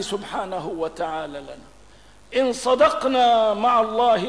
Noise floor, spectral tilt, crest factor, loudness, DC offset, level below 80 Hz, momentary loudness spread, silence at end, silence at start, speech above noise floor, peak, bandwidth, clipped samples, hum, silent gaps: -50 dBFS; -4 dB/octave; 14 dB; -21 LUFS; 0.3%; -54 dBFS; 13 LU; 0 s; 0 s; 30 dB; -6 dBFS; 11 kHz; under 0.1%; none; none